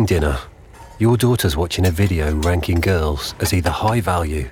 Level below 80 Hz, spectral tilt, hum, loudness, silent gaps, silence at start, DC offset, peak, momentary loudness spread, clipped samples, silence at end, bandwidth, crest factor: -28 dBFS; -6 dB/octave; none; -19 LUFS; none; 0 s; under 0.1%; -4 dBFS; 5 LU; under 0.1%; 0 s; 18 kHz; 14 dB